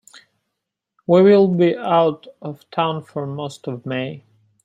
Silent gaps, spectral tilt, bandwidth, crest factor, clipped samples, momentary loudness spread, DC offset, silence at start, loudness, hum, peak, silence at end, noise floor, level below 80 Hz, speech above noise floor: none; -7.5 dB/octave; 9.6 kHz; 18 dB; under 0.1%; 19 LU; under 0.1%; 1.1 s; -18 LUFS; none; -2 dBFS; 0.45 s; -80 dBFS; -66 dBFS; 62 dB